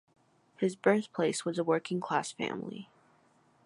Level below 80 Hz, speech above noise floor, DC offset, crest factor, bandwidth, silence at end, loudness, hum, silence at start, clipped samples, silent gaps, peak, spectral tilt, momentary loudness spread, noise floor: -80 dBFS; 35 dB; under 0.1%; 22 dB; 11.5 kHz; 0.8 s; -32 LUFS; none; 0.6 s; under 0.1%; none; -12 dBFS; -5 dB/octave; 10 LU; -67 dBFS